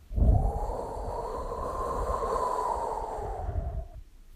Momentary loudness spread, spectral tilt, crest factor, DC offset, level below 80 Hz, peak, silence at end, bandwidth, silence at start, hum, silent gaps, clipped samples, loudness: 9 LU; -7.5 dB/octave; 18 dB; under 0.1%; -32 dBFS; -12 dBFS; 0 s; 14 kHz; 0 s; none; none; under 0.1%; -32 LUFS